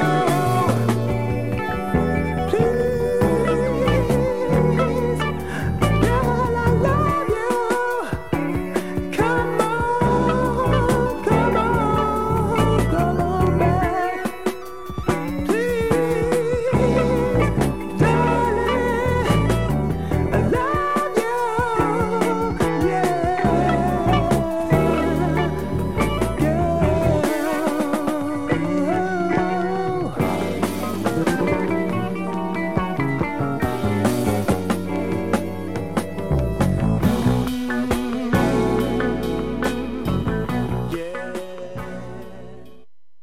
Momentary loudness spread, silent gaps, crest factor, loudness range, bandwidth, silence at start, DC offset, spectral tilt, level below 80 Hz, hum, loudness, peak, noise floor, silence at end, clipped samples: 6 LU; none; 18 dB; 3 LU; 16.5 kHz; 0 s; 1%; -7 dB/octave; -34 dBFS; none; -21 LUFS; -2 dBFS; -54 dBFS; 0.55 s; under 0.1%